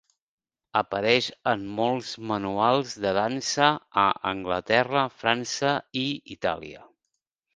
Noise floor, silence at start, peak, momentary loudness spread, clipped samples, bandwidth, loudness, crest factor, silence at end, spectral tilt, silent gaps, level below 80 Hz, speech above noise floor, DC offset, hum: -82 dBFS; 0.75 s; -4 dBFS; 8 LU; under 0.1%; 10 kHz; -25 LUFS; 22 dB; 0.7 s; -4 dB/octave; none; -60 dBFS; 56 dB; under 0.1%; none